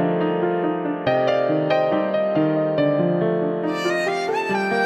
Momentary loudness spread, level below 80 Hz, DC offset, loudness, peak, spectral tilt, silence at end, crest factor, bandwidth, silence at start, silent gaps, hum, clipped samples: 3 LU; -64 dBFS; under 0.1%; -21 LUFS; -6 dBFS; -7 dB/octave; 0 s; 14 dB; 12.5 kHz; 0 s; none; none; under 0.1%